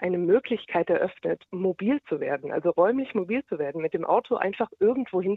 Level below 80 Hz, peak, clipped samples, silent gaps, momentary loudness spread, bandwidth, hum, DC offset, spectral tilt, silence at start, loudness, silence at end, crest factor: -68 dBFS; -8 dBFS; under 0.1%; none; 6 LU; 4.4 kHz; none; under 0.1%; -9.5 dB/octave; 0 s; -26 LUFS; 0 s; 18 dB